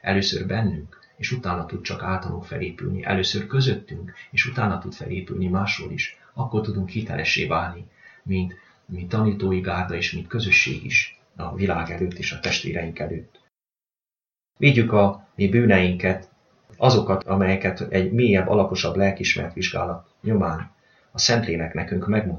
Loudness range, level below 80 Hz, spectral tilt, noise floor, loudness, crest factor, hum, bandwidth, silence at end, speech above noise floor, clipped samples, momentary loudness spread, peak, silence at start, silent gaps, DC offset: 6 LU; -48 dBFS; -5.5 dB/octave; under -90 dBFS; -23 LUFS; 20 dB; none; 7.4 kHz; 0 s; over 67 dB; under 0.1%; 13 LU; -2 dBFS; 0.05 s; none; under 0.1%